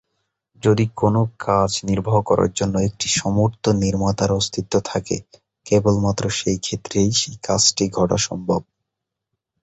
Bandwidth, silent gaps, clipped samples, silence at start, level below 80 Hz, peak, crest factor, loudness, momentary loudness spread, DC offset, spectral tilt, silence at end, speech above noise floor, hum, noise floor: 8.4 kHz; none; under 0.1%; 0.65 s; -42 dBFS; -2 dBFS; 18 dB; -20 LUFS; 6 LU; under 0.1%; -4.5 dB/octave; 1 s; 63 dB; none; -82 dBFS